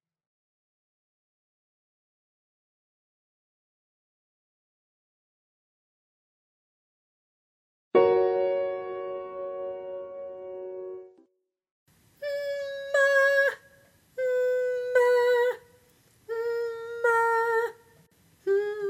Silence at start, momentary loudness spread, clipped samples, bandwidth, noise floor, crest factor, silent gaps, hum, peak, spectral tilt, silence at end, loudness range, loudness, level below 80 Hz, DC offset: 7.95 s; 17 LU; under 0.1%; 15.5 kHz; -72 dBFS; 22 dB; 11.71-11.86 s; none; -8 dBFS; -4 dB/octave; 0 s; 13 LU; -26 LUFS; -76 dBFS; under 0.1%